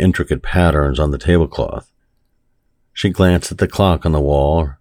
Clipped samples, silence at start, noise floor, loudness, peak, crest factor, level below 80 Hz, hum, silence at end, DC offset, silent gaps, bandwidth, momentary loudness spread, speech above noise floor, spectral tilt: under 0.1%; 0 s; -61 dBFS; -16 LUFS; 0 dBFS; 16 dB; -26 dBFS; none; 0.05 s; under 0.1%; none; 15.5 kHz; 7 LU; 47 dB; -6.5 dB/octave